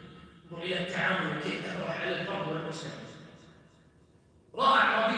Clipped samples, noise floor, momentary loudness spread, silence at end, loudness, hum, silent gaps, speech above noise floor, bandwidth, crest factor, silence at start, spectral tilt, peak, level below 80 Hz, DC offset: under 0.1%; -61 dBFS; 22 LU; 0 s; -30 LUFS; none; none; 31 dB; 10.5 kHz; 20 dB; 0 s; -5 dB/octave; -12 dBFS; -68 dBFS; under 0.1%